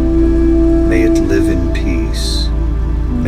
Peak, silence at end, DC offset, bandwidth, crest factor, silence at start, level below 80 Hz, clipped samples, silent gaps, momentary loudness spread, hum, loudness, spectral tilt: 0 dBFS; 0 s; under 0.1%; 12.5 kHz; 12 dB; 0 s; -16 dBFS; under 0.1%; none; 6 LU; none; -14 LUFS; -6.5 dB/octave